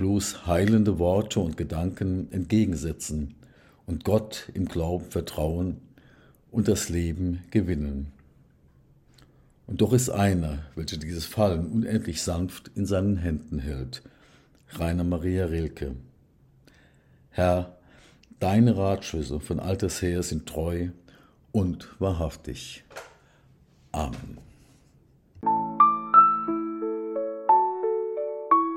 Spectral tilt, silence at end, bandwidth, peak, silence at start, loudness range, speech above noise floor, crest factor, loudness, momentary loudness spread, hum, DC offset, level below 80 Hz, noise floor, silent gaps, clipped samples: -6 dB/octave; 0 s; 16.5 kHz; -6 dBFS; 0 s; 8 LU; 33 dB; 22 dB; -26 LUFS; 15 LU; none; under 0.1%; -46 dBFS; -59 dBFS; none; under 0.1%